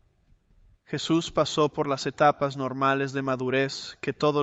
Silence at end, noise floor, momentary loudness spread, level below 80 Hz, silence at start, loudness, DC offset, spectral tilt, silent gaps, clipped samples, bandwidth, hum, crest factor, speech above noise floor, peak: 0 s; -63 dBFS; 9 LU; -60 dBFS; 0.9 s; -26 LUFS; under 0.1%; -5 dB/octave; none; under 0.1%; 8.2 kHz; none; 20 dB; 37 dB; -8 dBFS